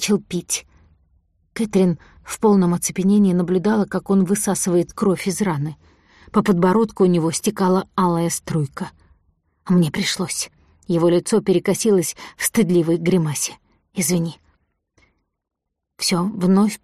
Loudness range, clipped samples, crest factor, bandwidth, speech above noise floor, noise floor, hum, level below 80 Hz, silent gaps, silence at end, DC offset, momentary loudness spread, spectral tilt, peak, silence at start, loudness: 4 LU; under 0.1%; 14 dB; 15 kHz; 46 dB; -64 dBFS; none; -54 dBFS; none; 0.1 s; under 0.1%; 9 LU; -5.5 dB/octave; -6 dBFS; 0 s; -19 LUFS